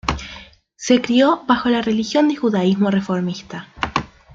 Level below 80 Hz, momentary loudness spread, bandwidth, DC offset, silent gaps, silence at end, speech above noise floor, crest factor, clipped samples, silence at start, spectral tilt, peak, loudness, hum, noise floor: -42 dBFS; 15 LU; 7.8 kHz; under 0.1%; none; 0.3 s; 24 dB; 16 dB; under 0.1%; 0.05 s; -5.5 dB/octave; -2 dBFS; -18 LUFS; none; -42 dBFS